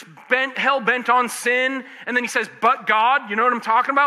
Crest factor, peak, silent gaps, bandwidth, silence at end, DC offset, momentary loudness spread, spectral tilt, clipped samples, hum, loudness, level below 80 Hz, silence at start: 16 dB; -4 dBFS; none; 14.5 kHz; 0 s; under 0.1%; 6 LU; -2.5 dB/octave; under 0.1%; none; -19 LUFS; -80 dBFS; 0 s